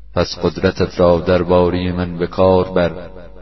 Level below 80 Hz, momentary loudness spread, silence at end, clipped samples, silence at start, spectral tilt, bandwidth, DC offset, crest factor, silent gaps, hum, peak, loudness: -36 dBFS; 8 LU; 0 s; under 0.1%; 0.15 s; -7.5 dB/octave; 6.2 kHz; 1%; 16 dB; none; none; 0 dBFS; -16 LUFS